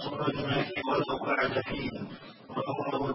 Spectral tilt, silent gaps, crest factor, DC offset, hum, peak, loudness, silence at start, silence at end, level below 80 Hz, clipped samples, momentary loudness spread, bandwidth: -9.5 dB/octave; none; 16 dB; under 0.1%; none; -16 dBFS; -31 LUFS; 0 s; 0 s; -58 dBFS; under 0.1%; 11 LU; 5.8 kHz